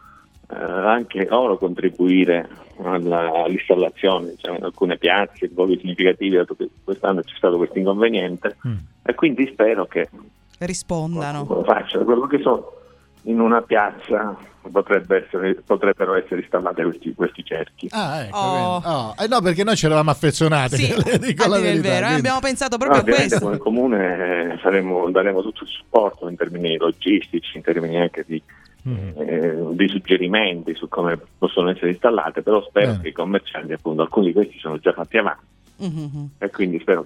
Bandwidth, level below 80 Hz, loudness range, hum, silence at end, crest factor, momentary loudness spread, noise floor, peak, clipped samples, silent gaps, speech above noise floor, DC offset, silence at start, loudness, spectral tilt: 14 kHz; -52 dBFS; 4 LU; none; 0 s; 20 dB; 11 LU; -48 dBFS; 0 dBFS; under 0.1%; none; 29 dB; under 0.1%; 0.5 s; -20 LUFS; -5.5 dB/octave